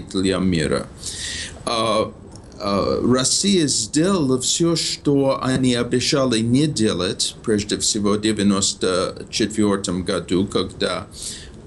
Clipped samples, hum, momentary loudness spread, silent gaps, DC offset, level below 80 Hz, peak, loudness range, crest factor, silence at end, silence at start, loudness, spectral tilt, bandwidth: under 0.1%; none; 8 LU; none; under 0.1%; -44 dBFS; -6 dBFS; 3 LU; 14 dB; 0 s; 0 s; -20 LUFS; -4 dB/octave; 12.5 kHz